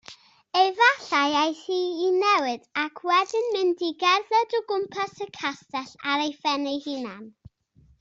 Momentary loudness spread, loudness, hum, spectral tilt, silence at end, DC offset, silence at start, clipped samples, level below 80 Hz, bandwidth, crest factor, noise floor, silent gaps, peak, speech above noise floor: 11 LU; -24 LUFS; none; -2.5 dB/octave; 0.7 s; under 0.1%; 0.1 s; under 0.1%; -70 dBFS; 7.8 kHz; 20 dB; -59 dBFS; none; -6 dBFS; 35 dB